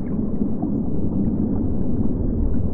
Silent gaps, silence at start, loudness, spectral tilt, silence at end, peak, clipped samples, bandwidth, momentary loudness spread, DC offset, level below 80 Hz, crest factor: none; 0 s; -23 LUFS; -15.5 dB/octave; 0 s; -8 dBFS; under 0.1%; 2.3 kHz; 2 LU; 5%; -28 dBFS; 12 dB